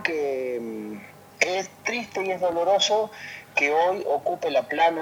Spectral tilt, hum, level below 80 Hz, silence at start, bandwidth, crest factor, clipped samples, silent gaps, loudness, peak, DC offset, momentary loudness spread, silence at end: -2.5 dB/octave; none; -70 dBFS; 0 s; 18 kHz; 20 dB; under 0.1%; none; -24 LUFS; -6 dBFS; under 0.1%; 12 LU; 0 s